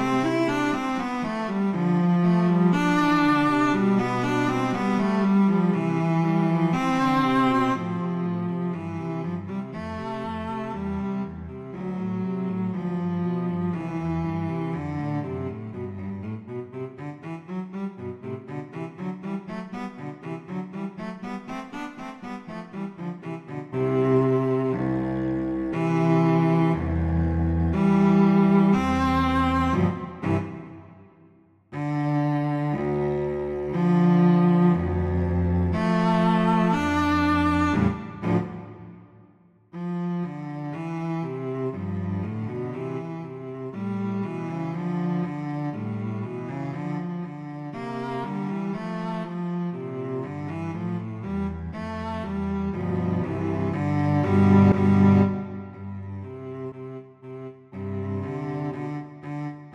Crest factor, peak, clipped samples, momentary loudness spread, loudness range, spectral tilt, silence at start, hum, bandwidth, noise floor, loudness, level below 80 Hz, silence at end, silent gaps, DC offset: 18 dB; -6 dBFS; under 0.1%; 15 LU; 13 LU; -8 dB/octave; 0 s; none; 9 kHz; -56 dBFS; -25 LUFS; -44 dBFS; 0 s; none; under 0.1%